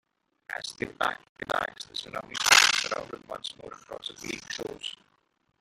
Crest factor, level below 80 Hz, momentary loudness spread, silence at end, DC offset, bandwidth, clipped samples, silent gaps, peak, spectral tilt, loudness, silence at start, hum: 28 dB; -64 dBFS; 21 LU; 0.7 s; under 0.1%; 16 kHz; under 0.1%; 1.29-1.36 s; -4 dBFS; 0 dB/octave; -26 LUFS; 0.5 s; none